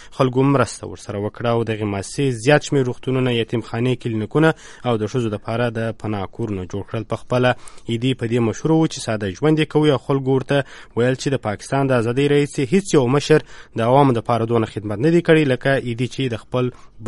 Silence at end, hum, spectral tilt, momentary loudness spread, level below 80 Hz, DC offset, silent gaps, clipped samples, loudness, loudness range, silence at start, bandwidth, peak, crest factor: 0 s; none; -6.5 dB/octave; 10 LU; -48 dBFS; under 0.1%; none; under 0.1%; -20 LUFS; 5 LU; 0 s; 11.5 kHz; 0 dBFS; 18 dB